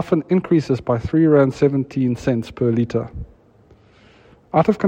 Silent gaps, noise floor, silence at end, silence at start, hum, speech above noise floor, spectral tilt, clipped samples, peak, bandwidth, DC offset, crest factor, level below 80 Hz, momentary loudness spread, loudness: none; -51 dBFS; 0 s; 0 s; none; 33 dB; -8.5 dB/octave; under 0.1%; -2 dBFS; 9 kHz; under 0.1%; 18 dB; -46 dBFS; 8 LU; -19 LUFS